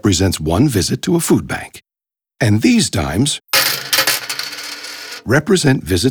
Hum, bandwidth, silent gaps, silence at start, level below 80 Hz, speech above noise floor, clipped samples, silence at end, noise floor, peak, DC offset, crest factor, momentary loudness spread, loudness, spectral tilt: none; over 20 kHz; none; 0.05 s; -40 dBFS; 72 dB; under 0.1%; 0 s; -87 dBFS; -2 dBFS; under 0.1%; 14 dB; 13 LU; -15 LUFS; -4 dB/octave